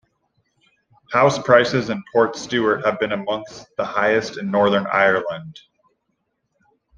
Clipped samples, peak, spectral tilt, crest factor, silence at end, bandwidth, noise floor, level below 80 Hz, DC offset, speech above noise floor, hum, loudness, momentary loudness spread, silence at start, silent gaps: under 0.1%; 0 dBFS; -5 dB/octave; 20 dB; 1.4 s; 9.4 kHz; -73 dBFS; -60 dBFS; under 0.1%; 54 dB; none; -19 LUFS; 13 LU; 1.1 s; none